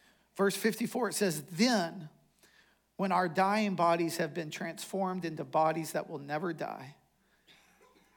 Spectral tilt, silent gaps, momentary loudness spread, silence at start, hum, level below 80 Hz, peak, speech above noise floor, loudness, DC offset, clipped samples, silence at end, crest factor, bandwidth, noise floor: -4.5 dB/octave; none; 11 LU; 0.35 s; none; -82 dBFS; -14 dBFS; 39 dB; -32 LUFS; under 0.1%; under 0.1%; 1.25 s; 20 dB; 18 kHz; -70 dBFS